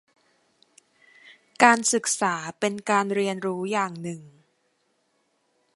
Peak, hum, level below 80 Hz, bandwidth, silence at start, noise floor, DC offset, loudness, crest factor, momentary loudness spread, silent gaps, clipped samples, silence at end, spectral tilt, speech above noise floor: 0 dBFS; none; -76 dBFS; 11.5 kHz; 1.25 s; -70 dBFS; under 0.1%; -23 LUFS; 26 dB; 13 LU; none; under 0.1%; 1.45 s; -3 dB/octave; 47 dB